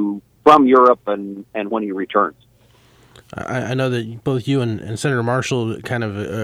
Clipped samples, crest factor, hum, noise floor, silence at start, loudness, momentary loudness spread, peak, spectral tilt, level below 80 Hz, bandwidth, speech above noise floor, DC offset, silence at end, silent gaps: under 0.1%; 18 dB; none; -52 dBFS; 0 s; -18 LUFS; 14 LU; 0 dBFS; -6.5 dB/octave; -54 dBFS; 14.5 kHz; 34 dB; under 0.1%; 0 s; none